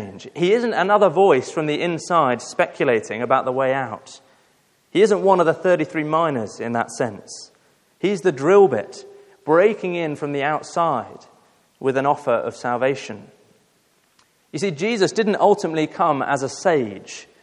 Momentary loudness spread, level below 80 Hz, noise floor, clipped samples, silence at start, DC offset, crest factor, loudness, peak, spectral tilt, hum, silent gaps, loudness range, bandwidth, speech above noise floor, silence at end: 14 LU; -72 dBFS; -61 dBFS; under 0.1%; 0 s; under 0.1%; 18 dB; -20 LUFS; -2 dBFS; -5.5 dB/octave; none; none; 5 LU; 11 kHz; 42 dB; 0.2 s